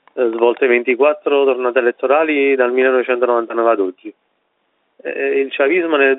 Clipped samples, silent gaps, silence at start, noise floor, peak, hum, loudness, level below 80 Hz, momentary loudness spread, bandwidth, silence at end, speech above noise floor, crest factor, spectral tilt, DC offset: under 0.1%; none; 0.15 s; -66 dBFS; 0 dBFS; none; -15 LUFS; -70 dBFS; 6 LU; 4 kHz; 0 s; 51 dB; 16 dB; -1 dB/octave; under 0.1%